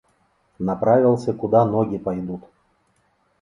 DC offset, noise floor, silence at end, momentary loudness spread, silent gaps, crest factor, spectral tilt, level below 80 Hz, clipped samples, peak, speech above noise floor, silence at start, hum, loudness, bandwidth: under 0.1%; -65 dBFS; 1 s; 12 LU; none; 18 dB; -9.5 dB/octave; -56 dBFS; under 0.1%; -4 dBFS; 45 dB; 0.6 s; none; -20 LUFS; 10.5 kHz